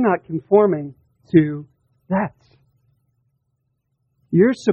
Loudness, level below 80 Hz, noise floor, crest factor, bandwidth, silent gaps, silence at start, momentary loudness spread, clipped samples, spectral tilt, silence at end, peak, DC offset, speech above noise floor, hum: -19 LUFS; -58 dBFS; -71 dBFS; 20 dB; 8.4 kHz; none; 0 s; 12 LU; under 0.1%; -8.5 dB/octave; 0 s; -2 dBFS; under 0.1%; 54 dB; none